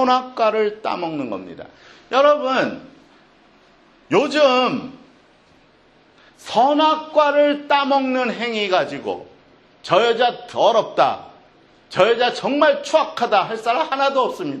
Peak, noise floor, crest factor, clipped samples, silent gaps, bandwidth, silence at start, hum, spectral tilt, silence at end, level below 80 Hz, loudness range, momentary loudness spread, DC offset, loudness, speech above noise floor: 0 dBFS; -53 dBFS; 20 dB; under 0.1%; none; 10.5 kHz; 0 s; none; -4.5 dB/octave; 0 s; -66 dBFS; 4 LU; 13 LU; under 0.1%; -18 LUFS; 35 dB